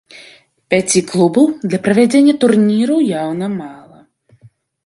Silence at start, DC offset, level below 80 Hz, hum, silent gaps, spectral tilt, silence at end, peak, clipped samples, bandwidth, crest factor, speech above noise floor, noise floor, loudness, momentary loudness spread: 0.15 s; under 0.1%; -58 dBFS; none; none; -5 dB/octave; 1.1 s; 0 dBFS; under 0.1%; 11.5 kHz; 14 dB; 35 dB; -48 dBFS; -13 LUFS; 10 LU